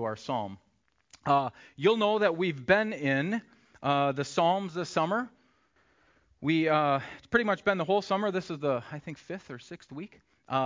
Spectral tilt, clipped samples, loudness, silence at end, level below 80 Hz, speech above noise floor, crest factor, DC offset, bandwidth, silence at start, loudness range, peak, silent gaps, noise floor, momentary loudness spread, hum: -6 dB/octave; under 0.1%; -29 LUFS; 0 s; -66 dBFS; 39 dB; 20 dB; under 0.1%; 7.6 kHz; 0 s; 3 LU; -8 dBFS; none; -68 dBFS; 16 LU; none